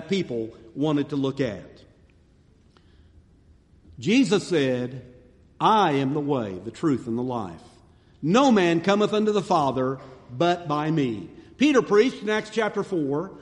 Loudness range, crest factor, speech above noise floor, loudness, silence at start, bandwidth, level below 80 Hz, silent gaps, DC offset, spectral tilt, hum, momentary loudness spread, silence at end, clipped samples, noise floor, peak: 7 LU; 20 dB; 34 dB; -23 LUFS; 0 s; 11 kHz; -60 dBFS; none; under 0.1%; -6 dB/octave; none; 13 LU; 0 s; under 0.1%; -57 dBFS; -4 dBFS